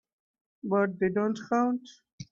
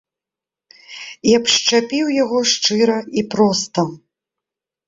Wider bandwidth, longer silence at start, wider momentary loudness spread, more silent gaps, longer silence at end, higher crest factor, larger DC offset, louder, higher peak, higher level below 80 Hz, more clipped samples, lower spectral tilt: about the same, 7.4 kHz vs 7.8 kHz; second, 0.65 s vs 0.9 s; about the same, 12 LU vs 11 LU; first, 2.13-2.18 s vs none; second, 0.1 s vs 0.9 s; about the same, 14 dB vs 16 dB; neither; second, -28 LUFS vs -16 LUFS; second, -16 dBFS vs -2 dBFS; second, -70 dBFS vs -60 dBFS; neither; first, -7 dB/octave vs -3 dB/octave